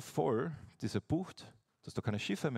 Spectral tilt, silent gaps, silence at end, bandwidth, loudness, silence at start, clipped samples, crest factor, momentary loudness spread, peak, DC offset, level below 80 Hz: -6 dB/octave; none; 0 s; 15.5 kHz; -38 LUFS; 0 s; under 0.1%; 18 dB; 19 LU; -20 dBFS; under 0.1%; -64 dBFS